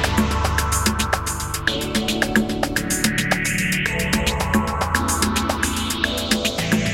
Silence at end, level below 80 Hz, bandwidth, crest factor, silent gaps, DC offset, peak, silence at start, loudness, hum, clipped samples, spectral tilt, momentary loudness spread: 0 s; -32 dBFS; 17 kHz; 20 dB; none; under 0.1%; 0 dBFS; 0 s; -20 LUFS; none; under 0.1%; -3.5 dB/octave; 3 LU